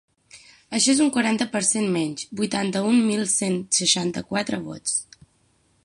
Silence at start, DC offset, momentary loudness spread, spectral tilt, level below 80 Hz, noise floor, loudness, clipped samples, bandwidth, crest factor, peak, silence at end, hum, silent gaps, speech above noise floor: 0.35 s; under 0.1%; 9 LU; -3 dB/octave; -64 dBFS; -64 dBFS; -22 LUFS; under 0.1%; 11.5 kHz; 18 dB; -6 dBFS; 0.8 s; none; none; 41 dB